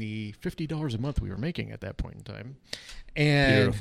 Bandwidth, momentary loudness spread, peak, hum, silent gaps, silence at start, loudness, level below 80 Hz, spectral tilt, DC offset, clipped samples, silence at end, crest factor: 13.5 kHz; 19 LU; -10 dBFS; none; none; 0 s; -28 LUFS; -42 dBFS; -6.5 dB/octave; under 0.1%; under 0.1%; 0 s; 18 dB